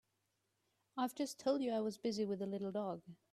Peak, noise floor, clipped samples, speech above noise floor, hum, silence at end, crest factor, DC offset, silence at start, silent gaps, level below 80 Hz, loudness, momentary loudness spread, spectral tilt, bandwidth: -24 dBFS; -84 dBFS; under 0.1%; 44 dB; none; 0.2 s; 18 dB; under 0.1%; 0.95 s; none; -84 dBFS; -40 LUFS; 7 LU; -5.5 dB/octave; 15 kHz